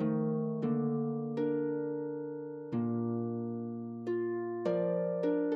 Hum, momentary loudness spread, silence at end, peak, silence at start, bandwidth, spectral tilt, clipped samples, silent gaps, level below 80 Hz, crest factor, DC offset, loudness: none; 7 LU; 0 s; -20 dBFS; 0 s; 5.6 kHz; -9.5 dB/octave; under 0.1%; none; -80 dBFS; 12 dB; under 0.1%; -35 LUFS